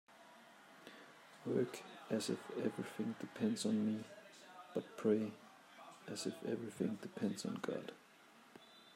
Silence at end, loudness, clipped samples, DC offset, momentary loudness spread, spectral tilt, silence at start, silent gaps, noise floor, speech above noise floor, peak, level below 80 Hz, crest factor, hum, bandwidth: 0 s; -42 LUFS; under 0.1%; under 0.1%; 23 LU; -5.5 dB/octave; 0.1 s; none; -64 dBFS; 24 dB; -22 dBFS; -90 dBFS; 20 dB; none; 16 kHz